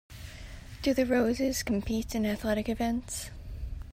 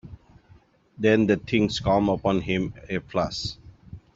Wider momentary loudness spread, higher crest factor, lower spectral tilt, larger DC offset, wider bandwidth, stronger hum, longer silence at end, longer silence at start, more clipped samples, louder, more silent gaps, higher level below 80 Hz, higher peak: first, 18 LU vs 11 LU; about the same, 16 dB vs 20 dB; about the same, -5 dB/octave vs -6 dB/octave; neither; first, 16 kHz vs 7.8 kHz; neither; second, 0 s vs 0.15 s; about the same, 0.1 s vs 0.05 s; neither; second, -30 LUFS vs -24 LUFS; neither; about the same, -44 dBFS vs -48 dBFS; second, -16 dBFS vs -6 dBFS